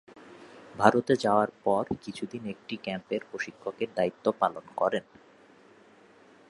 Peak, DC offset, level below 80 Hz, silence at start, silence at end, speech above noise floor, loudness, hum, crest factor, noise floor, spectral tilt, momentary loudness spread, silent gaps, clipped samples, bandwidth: -4 dBFS; under 0.1%; -66 dBFS; 0.15 s; 1.5 s; 28 dB; -29 LUFS; none; 26 dB; -57 dBFS; -6 dB/octave; 14 LU; none; under 0.1%; 11.5 kHz